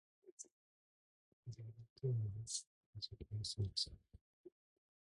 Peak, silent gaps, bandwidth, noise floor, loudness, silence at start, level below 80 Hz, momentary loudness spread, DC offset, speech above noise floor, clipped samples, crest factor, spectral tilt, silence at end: -28 dBFS; 0.32-0.38 s, 0.52-1.43 s, 1.90-1.96 s, 2.67-2.93 s, 4.21-4.44 s; 11 kHz; under -90 dBFS; -45 LUFS; 0.25 s; -66 dBFS; 24 LU; under 0.1%; over 46 dB; under 0.1%; 20 dB; -4.5 dB/octave; 0.55 s